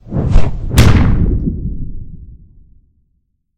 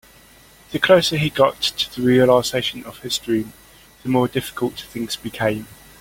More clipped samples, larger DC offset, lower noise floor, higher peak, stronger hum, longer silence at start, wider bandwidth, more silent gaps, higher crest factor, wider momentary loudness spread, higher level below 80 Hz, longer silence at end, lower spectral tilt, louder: first, 0.6% vs under 0.1%; neither; first, -63 dBFS vs -48 dBFS; about the same, 0 dBFS vs -2 dBFS; neither; second, 0.05 s vs 0.7 s; about the same, 16 kHz vs 17 kHz; neither; second, 14 dB vs 20 dB; first, 20 LU vs 15 LU; first, -18 dBFS vs -50 dBFS; second, 0 s vs 0.25 s; first, -6.5 dB/octave vs -4.5 dB/octave; first, -14 LUFS vs -19 LUFS